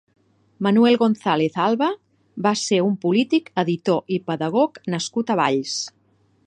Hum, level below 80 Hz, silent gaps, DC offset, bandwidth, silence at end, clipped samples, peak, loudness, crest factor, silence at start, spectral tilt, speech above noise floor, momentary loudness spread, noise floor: none; -70 dBFS; none; under 0.1%; 9.8 kHz; 0.55 s; under 0.1%; -4 dBFS; -21 LUFS; 18 dB; 0.6 s; -5 dB/octave; 41 dB; 9 LU; -61 dBFS